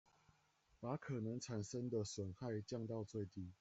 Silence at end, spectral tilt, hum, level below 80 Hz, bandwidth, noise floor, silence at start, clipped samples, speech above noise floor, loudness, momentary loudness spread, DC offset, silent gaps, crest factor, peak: 0.05 s; -6 dB/octave; none; -78 dBFS; 8.2 kHz; -77 dBFS; 0.8 s; under 0.1%; 32 dB; -47 LUFS; 4 LU; under 0.1%; none; 16 dB; -30 dBFS